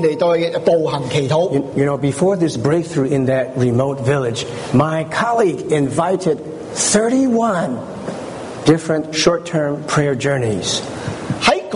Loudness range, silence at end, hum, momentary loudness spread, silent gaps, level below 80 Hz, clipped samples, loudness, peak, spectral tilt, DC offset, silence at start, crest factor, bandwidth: 1 LU; 0 s; none; 8 LU; none; -50 dBFS; under 0.1%; -17 LUFS; -2 dBFS; -5 dB/octave; under 0.1%; 0 s; 16 dB; 11 kHz